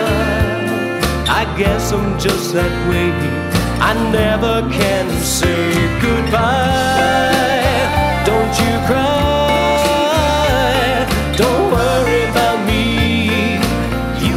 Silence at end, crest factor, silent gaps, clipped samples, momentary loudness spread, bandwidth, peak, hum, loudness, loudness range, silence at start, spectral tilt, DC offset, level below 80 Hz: 0 s; 12 dB; none; under 0.1%; 4 LU; 16 kHz; -2 dBFS; none; -15 LUFS; 2 LU; 0 s; -5 dB/octave; under 0.1%; -26 dBFS